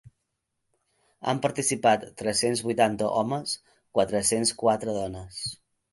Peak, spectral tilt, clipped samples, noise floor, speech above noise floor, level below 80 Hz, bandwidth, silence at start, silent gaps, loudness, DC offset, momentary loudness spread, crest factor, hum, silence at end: -8 dBFS; -3.5 dB/octave; under 0.1%; -80 dBFS; 54 dB; -58 dBFS; 12 kHz; 1.2 s; none; -26 LUFS; under 0.1%; 11 LU; 20 dB; none; 0.4 s